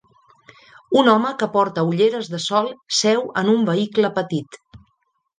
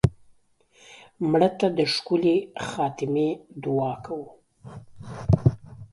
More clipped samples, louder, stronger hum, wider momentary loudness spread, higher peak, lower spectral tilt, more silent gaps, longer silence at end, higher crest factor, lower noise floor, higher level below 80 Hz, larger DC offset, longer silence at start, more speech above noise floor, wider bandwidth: neither; first, -19 LUFS vs -25 LUFS; neither; second, 8 LU vs 21 LU; first, -2 dBFS vs -6 dBFS; second, -4.5 dB/octave vs -7 dB/octave; neither; first, 0.6 s vs 0.05 s; about the same, 18 dB vs 20 dB; first, -69 dBFS vs -60 dBFS; second, -64 dBFS vs -44 dBFS; neither; first, 0.9 s vs 0.05 s; first, 50 dB vs 36 dB; second, 9.8 kHz vs 11.5 kHz